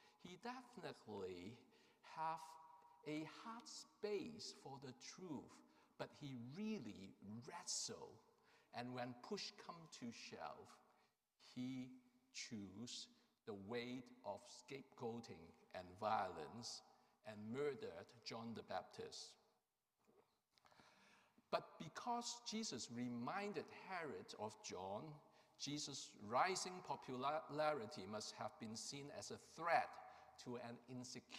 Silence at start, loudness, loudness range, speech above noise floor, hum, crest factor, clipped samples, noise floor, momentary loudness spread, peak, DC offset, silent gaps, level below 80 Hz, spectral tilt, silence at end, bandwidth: 0 s; -50 LUFS; 8 LU; 39 dB; none; 26 dB; under 0.1%; -89 dBFS; 15 LU; -26 dBFS; under 0.1%; none; under -90 dBFS; -3.5 dB/octave; 0 s; 15.5 kHz